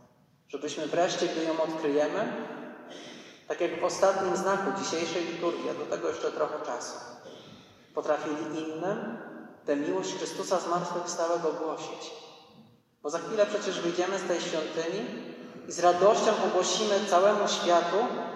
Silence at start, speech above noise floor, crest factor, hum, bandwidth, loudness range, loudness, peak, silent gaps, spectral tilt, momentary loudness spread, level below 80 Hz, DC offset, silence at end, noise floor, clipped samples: 0.5 s; 33 dB; 20 dB; none; 12.5 kHz; 7 LU; -29 LUFS; -10 dBFS; none; -3.5 dB/octave; 18 LU; -82 dBFS; under 0.1%; 0 s; -61 dBFS; under 0.1%